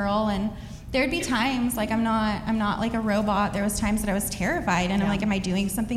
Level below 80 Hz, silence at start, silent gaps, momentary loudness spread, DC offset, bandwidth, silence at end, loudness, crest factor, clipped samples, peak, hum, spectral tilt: -40 dBFS; 0 s; none; 3 LU; under 0.1%; 15.5 kHz; 0 s; -25 LUFS; 14 dB; under 0.1%; -12 dBFS; none; -5 dB/octave